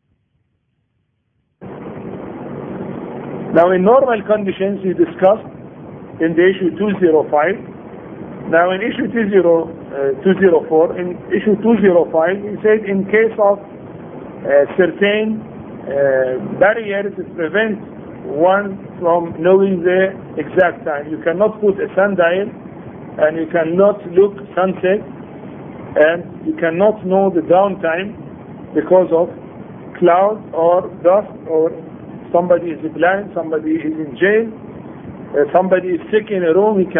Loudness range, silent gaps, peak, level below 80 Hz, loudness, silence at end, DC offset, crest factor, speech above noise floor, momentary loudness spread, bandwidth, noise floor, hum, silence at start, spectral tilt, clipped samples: 3 LU; none; 0 dBFS; -54 dBFS; -15 LUFS; 0 s; under 0.1%; 16 dB; 52 dB; 20 LU; 3.7 kHz; -66 dBFS; none; 1.6 s; -10 dB/octave; under 0.1%